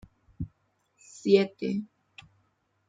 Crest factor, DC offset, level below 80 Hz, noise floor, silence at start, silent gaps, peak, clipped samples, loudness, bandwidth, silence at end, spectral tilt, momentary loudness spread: 24 dB; under 0.1%; -58 dBFS; -72 dBFS; 0.4 s; none; -8 dBFS; under 0.1%; -27 LUFS; 7.8 kHz; 1.05 s; -6.5 dB/octave; 18 LU